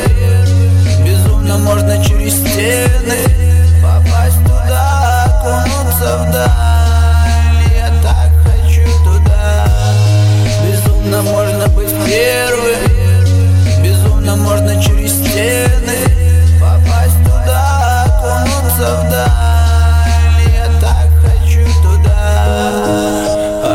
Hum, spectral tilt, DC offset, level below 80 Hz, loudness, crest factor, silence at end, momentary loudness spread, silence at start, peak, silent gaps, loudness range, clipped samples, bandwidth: none; -5.5 dB/octave; under 0.1%; -12 dBFS; -11 LUFS; 8 dB; 0 s; 3 LU; 0 s; 0 dBFS; none; 1 LU; under 0.1%; 16.5 kHz